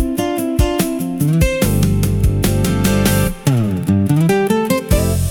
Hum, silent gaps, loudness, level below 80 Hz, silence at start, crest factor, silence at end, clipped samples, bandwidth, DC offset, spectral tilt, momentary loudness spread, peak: none; none; -16 LUFS; -24 dBFS; 0 s; 14 dB; 0 s; under 0.1%; 18 kHz; under 0.1%; -6 dB/octave; 4 LU; -2 dBFS